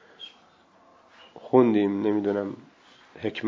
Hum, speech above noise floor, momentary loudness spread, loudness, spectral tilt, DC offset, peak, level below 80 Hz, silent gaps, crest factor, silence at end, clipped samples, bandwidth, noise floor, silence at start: none; 35 dB; 24 LU; -24 LUFS; -8 dB/octave; under 0.1%; -6 dBFS; -68 dBFS; none; 22 dB; 0 s; under 0.1%; 7 kHz; -58 dBFS; 0.2 s